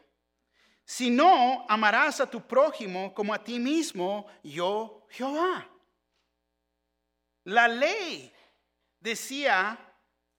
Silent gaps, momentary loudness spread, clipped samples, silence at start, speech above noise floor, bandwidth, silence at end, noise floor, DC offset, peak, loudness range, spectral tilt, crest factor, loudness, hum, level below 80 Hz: none; 15 LU; under 0.1%; 0.9 s; 54 dB; 17.5 kHz; 0.6 s; -80 dBFS; under 0.1%; -6 dBFS; 8 LU; -3 dB/octave; 22 dB; -26 LUFS; none; -82 dBFS